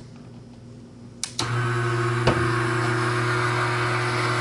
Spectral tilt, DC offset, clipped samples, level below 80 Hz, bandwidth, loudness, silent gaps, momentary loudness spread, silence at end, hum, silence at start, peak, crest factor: -5 dB/octave; under 0.1%; under 0.1%; -50 dBFS; 11.5 kHz; -23 LUFS; none; 22 LU; 0 s; none; 0 s; -6 dBFS; 18 dB